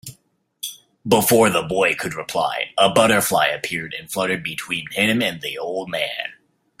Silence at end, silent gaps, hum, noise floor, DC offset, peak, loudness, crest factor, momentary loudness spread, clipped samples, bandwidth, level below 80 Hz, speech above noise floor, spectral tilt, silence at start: 0.45 s; none; none; -61 dBFS; under 0.1%; -2 dBFS; -19 LUFS; 20 dB; 16 LU; under 0.1%; 16 kHz; -56 dBFS; 41 dB; -3.5 dB/octave; 0.05 s